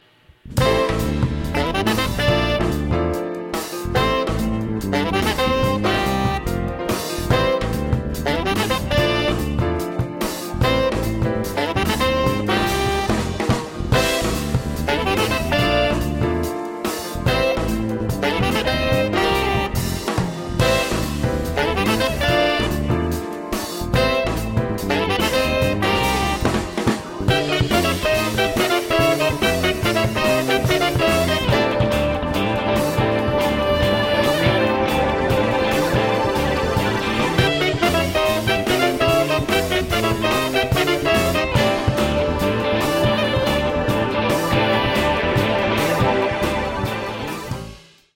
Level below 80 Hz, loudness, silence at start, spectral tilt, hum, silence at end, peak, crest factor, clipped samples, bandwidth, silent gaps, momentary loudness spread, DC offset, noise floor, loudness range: -32 dBFS; -19 LUFS; 0.45 s; -5 dB/octave; none; 0.35 s; -2 dBFS; 16 dB; under 0.1%; 17 kHz; none; 6 LU; under 0.1%; -45 dBFS; 3 LU